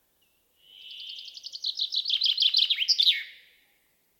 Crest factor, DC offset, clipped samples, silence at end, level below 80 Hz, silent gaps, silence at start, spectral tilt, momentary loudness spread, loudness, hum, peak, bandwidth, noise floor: 20 dB; under 0.1%; under 0.1%; 0.85 s; -86 dBFS; none; 0.75 s; 5.5 dB/octave; 19 LU; -23 LUFS; none; -10 dBFS; 17.5 kHz; -69 dBFS